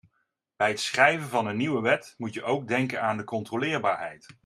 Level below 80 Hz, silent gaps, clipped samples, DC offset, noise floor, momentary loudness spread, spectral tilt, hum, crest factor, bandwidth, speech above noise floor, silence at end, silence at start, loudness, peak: -72 dBFS; none; under 0.1%; under 0.1%; -76 dBFS; 11 LU; -4.5 dB/octave; none; 24 dB; 14.5 kHz; 49 dB; 0.15 s; 0.6 s; -26 LUFS; -4 dBFS